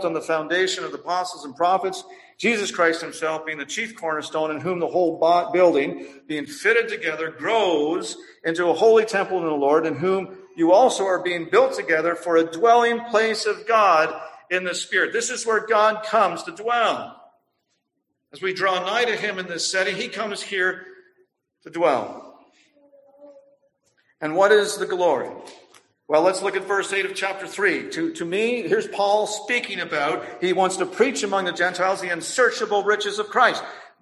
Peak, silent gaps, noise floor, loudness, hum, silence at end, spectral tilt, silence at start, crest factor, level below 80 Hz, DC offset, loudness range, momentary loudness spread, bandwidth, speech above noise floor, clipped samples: -4 dBFS; none; -76 dBFS; -21 LUFS; none; 0.15 s; -3 dB/octave; 0 s; 18 dB; -72 dBFS; under 0.1%; 5 LU; 10 LU; 12.5 kHz; 55 dB; under 0.1%